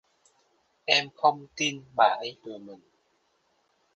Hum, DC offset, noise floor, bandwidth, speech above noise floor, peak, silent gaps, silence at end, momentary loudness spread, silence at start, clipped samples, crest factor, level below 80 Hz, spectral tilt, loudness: none; under 0.1%; -71 dBFS; 9.8 kHz; 44 dB; -4 dBFS; none; 1.2 s; 19 LU; 0.9 s; under 0.1%; 26 dB; -76 dBFS; -2 dB/octave; -26 LUFS